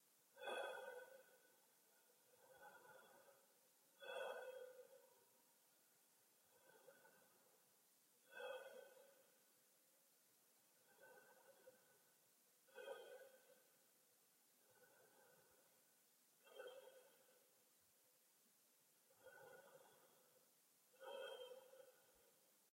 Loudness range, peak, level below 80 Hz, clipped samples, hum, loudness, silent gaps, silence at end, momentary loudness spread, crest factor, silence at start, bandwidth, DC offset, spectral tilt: 8 LU; -38 dBFS; under -90 dBFS; under 0.1%; none; -58 LUFS; none; 0.05 s; 16 LU; 24 dB; 0 s; 16 kHz; under 0.1%; -1 dB/octave